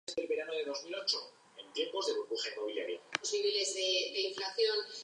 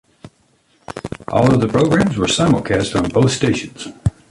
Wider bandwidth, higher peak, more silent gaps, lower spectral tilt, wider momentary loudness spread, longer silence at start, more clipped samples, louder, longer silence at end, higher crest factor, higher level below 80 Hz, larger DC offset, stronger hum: about the same, 10.5 kHz vs 11.5 kHz; second, -12 dBFS vs -2 dBFS; neither; second, 0 dB/octave vs -5.5 dB/octave; second, 7 LU vs 15 LU; second, 0.1 s vs 0.25 s; neither; second, -35 LUFS vs -16 LUFS; second, 0 s vs 0.2 s; first, 24 dB vs 14 dB; second, -88 dBFS vs -38 dBFS; neither; neither